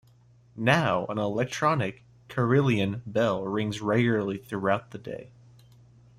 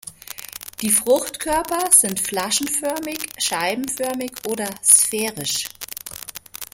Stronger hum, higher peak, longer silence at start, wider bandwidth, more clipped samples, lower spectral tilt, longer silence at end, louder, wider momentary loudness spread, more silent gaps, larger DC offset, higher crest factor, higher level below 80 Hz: neither; second, -8 dBFS vs 0 dBFS; first, 0.55 s vs 0.05 s; second, 14.5 kHz vs 17 kHz; neither; first, -6.5 dB/octave vs -1 dB/octave; first, 0.9 s vs 0.1 s; second, -27 LUFS vs -19 LUFS; second, 11 LU vs 20 LU; neither; neither; about the same, 20 dB vs 22 dB; second, -62 dBFS vs -54 dBFS